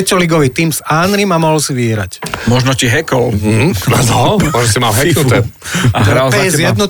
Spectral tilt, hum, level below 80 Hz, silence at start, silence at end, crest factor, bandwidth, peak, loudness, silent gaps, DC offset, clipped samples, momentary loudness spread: -4.5 dB/octave; none; -34 dBFS; 0 s; 0 s; 10 dB; 19 kHz; -2 dBFS; -11 LUFS; none; under 0.1%; under 0.1%; 4 LU